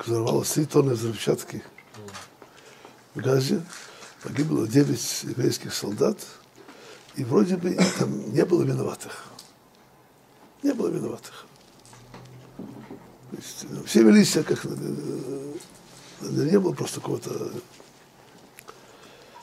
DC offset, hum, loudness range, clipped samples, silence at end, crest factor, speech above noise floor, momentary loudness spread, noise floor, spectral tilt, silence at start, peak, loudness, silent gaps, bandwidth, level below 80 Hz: under 0.1%; none; 10 LU; under 0.1%; 0 s; 22 dB; 31 dB; 24 LU; -55 dBFS; -5.5 dB/octave; 0 s; -4 dBFS; -24 LUFS; none; 16 kHz; -66 dBFS